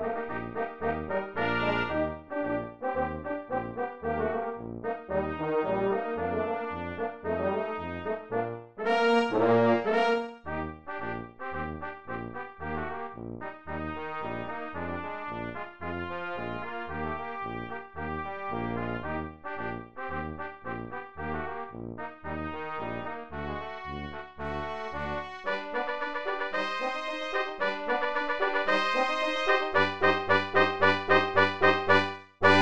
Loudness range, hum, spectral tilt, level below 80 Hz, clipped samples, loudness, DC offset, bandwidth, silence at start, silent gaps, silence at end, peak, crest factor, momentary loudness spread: 11 LU; none; -6 dB/octave; -52 dBFS; under 0.1%; -30 LUFS; 0.4%; 9.2 kHz; 0 s; none; 0 s; -6 dBFS; 24 dB; 14 LU